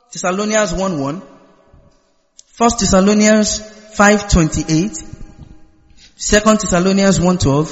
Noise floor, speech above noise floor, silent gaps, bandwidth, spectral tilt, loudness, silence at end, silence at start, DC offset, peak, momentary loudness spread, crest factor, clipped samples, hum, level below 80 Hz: -56 dBFS; 43 dB; none; 8.4 kHz; -4.5 dB/octave; -14 LUFS; 0 s; 0.1 s; under 0.1%; 0 dBFS; 12 LU; 16 dB; under 0.1%; none; -30 dBFS